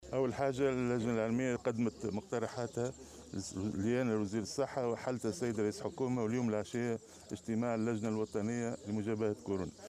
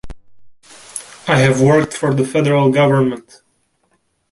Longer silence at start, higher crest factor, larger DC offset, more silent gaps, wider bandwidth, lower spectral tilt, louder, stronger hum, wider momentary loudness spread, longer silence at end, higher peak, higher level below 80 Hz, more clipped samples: about the same, 0 s vs 0.05 s; about the same, 14 dB vs 16 dB; neither; neither; first, 13.5 kHz vs 11.5 kHz; about the same, -6 dB/octave vs -6 dB/octave; second, -36 LUFS vs -14 LUFS; neither; second, 6 LU vs 18 LU; second, 0 s vs 1.1 s; second, -22 dBFS vs 0 dBFS; second, -66 dBFS vs -46 dBFS; neither